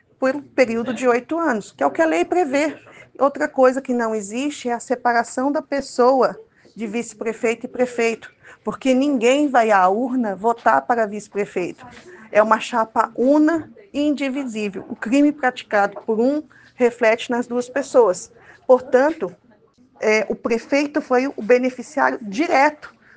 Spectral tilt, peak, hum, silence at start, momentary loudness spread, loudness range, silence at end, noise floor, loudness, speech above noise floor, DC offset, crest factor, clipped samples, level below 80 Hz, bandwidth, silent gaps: -4.5 dB/octave; 0 dBFS; none; 0.2 s; 10 LU; 3 LU; 0.3 s; -54 dBFS; -20 LUFS; 35 dB; under 0.1%; 20 dB; under 0.1%; -64 dBFS; 9.6 kHz; none